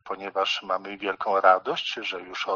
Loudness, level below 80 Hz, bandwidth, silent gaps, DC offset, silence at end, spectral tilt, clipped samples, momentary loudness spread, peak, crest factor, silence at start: -25 LUFS; -72 dBFS; 7.2 kHz; none; under 0.1%; 0 s; 0.5 dB/octave; under 0.1%; 11 LU; -4 dBFS; 22 dB; 0.05 s